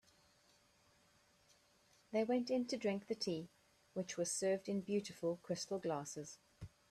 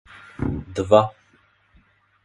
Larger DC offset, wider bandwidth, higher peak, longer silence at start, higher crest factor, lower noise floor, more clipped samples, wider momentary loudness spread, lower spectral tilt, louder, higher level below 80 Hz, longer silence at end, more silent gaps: neither; first, 13.5 kHz vs 11.5 kHz; second, -26 dBFS vs 0 dBFS; first, 2.1 s vs 0.4 s; second, 16 dB vs 24 dB; first, -73 dBFS vs -60 dBFS; neither; about the same, 14 LU vs 12 LU; second, -4.5 dB/octave vs -7 dB/octave; second, -41 LUFS vs -21 LUFS; second, -78 dBFS vs -44 dBFS; second, 0.25 s vs 1.15 s; neither